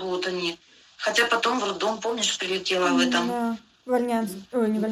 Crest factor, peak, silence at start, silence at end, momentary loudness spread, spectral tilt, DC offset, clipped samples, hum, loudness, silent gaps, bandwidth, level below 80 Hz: 18 dB; -6 dBFS; 0 s; 0 s; 9 LU; -3 dB/octave; under 0.1%; under 0.1%; none; -25 LUFS; none; 15.5 kHz; -66 dBFS